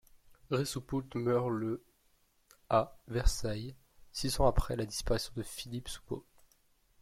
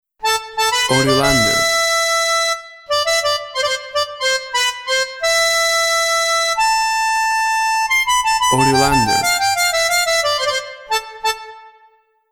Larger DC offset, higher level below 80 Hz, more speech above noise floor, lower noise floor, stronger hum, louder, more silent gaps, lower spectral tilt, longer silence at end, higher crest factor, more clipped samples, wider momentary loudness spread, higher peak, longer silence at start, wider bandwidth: neither; about the same, -42 dBFS vs -42 dBFS; about the same, 38 dB vs 40 dB; first, -71 dBFS vs -54 dBFS; neither; second, -35 LUFS vs -15 LUFS; neither; first, -5 dB/octave vs -2 dB/octave; first, 0.8 s vs 0.65 s; about the same, 20 dB vs 16 dB; neither; first, 12 LU vs 7 LU; second, -14 dBFS vs -2 dBFS; about the same, 0.15 s vs 0.2 s; second, 16 kHz vs over 20 kHz